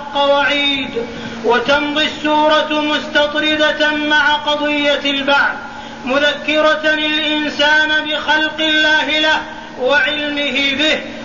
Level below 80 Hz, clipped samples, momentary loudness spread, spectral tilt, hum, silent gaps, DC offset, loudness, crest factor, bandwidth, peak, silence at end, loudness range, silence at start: -48 dBFS; under 0.1%; 6 LU; -2.5 dB/octave; none; none; 0.7%; -14 LUFS; 12 dB; 7.4 kHz; -2 dBFS; 0 s; 1 LU; 0 s